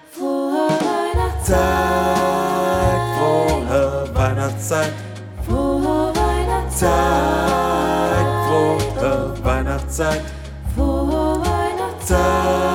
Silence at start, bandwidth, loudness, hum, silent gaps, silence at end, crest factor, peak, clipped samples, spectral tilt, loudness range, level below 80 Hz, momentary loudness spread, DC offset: 0.1 s; 17 kHz; -19 LUFS; none; none; 0 s; 14 dB; -4 dBFS; under 0.1%; -5.5 dB/octave; 2 LU; -28 dBFS; 6 LU; under 0.1%